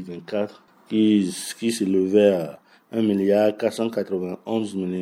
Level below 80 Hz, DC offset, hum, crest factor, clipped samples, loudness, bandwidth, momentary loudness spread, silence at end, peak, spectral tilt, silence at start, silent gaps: -74 dBFS; under 0.1%; none; 18 dB; under 0.1%; -22 LUFS; 16.5 kHz; 10 LU; 0 s; -4 dBFS; -6 dB/octave; 0 s; none